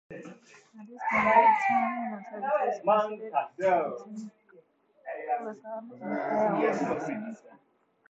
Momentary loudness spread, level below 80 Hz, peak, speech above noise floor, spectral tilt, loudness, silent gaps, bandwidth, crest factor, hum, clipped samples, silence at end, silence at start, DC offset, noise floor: 22 LU; -70 dBFS; -8 dBFS; 33 dB; -6 dB/octave; -28 LUFS; none; 8 kHz; 22 dB; none; under 0.1%; 0.75 s; 0.1 s; under 0.1%; -61 dBFS